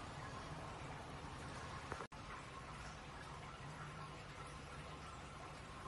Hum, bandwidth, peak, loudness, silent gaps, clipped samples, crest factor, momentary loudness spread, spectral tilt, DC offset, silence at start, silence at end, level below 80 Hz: none; 11.5 kHz; -32 dBFS; -51 LUFS; 2.07-2.11 s; under 0.1%; 20 dB; 3 LU; -4.5 dB/octave; under 0.1%; 0 s; 0 s; -62 dBFS